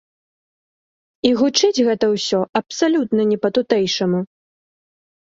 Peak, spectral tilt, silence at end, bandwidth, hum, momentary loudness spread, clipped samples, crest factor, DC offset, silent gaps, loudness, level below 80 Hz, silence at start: -2 dBFS; -4.5 dB/octave; 1.15 s; 7.8 kHz; none; 6 LU; under 0.1%; 18 dB; under 0.1%; 2.49-2.53 s; -18 LUFS; -62 dBFS; 1.25 s